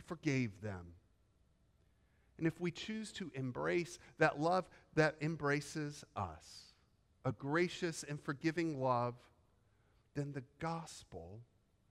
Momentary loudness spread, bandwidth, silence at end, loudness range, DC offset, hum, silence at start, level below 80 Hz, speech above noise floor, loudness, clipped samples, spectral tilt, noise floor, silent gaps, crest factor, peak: 17 LU; 14 kHz; 0.5 s; 6 LU; under 0.1%; none; 0 s; -70 dBFS; 34 dB; -39 LUFS; under 0.1%; -5.5 dB/octave; -73 dBFS; none; 22 dB; -18 dBFS